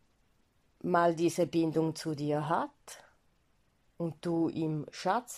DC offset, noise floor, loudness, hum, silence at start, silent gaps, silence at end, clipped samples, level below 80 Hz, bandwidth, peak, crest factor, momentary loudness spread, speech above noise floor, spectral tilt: under 0.1%; -72 dBFS; -32 LUFS; none; 0.85 s; none; 0 s; under 0.1%; -72 dBFS; 14 kHz; -14 dBFS; 20 dB; 13 LU; 40 dB; -6 dB/octave